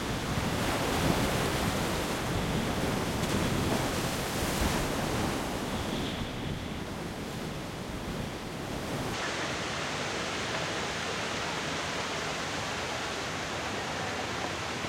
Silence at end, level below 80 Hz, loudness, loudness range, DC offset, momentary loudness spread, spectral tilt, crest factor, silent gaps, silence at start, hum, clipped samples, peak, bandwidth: 0 s; -46 dBFS; -32 LUFS; 6 LU; under 0.1%; 8 LU; -4 dB/octave; 20 dB; none; 0 s; none; under 0.1%; -12 dBFS; 16.5 kHz